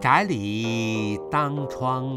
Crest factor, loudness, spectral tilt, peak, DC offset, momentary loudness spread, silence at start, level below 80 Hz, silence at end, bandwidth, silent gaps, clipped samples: 20 dB; -25 LUFS; -6 dB/octave; -4 dBFS; under 0.1%; 7 LU; 0 s; -56 dBFS; 0 s; 14.5 kHz; none; under 0.1%